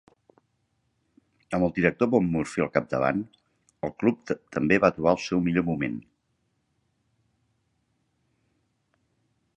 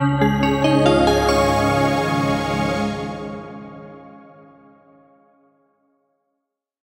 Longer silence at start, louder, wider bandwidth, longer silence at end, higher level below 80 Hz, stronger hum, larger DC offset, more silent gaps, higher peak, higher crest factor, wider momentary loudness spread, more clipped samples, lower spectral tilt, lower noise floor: first, 1.5 s vs 0 s; second, -26 LUFS vs -18 LUFS; second, 11 kHz vs 16 kHz; first, 3.55 s vs 2.65 s; second, -56 dBFS vs -38 dBFS; neither; neither; neither; about the same, -4 dBFS vs -4 dBFS; first, 24 dB vs 18 dB; second, 11 LU vs 21 LU; neither; about the same, -7 dB/octave vs -6 dB/octave; second, -74 dBFS vs -79 dBFS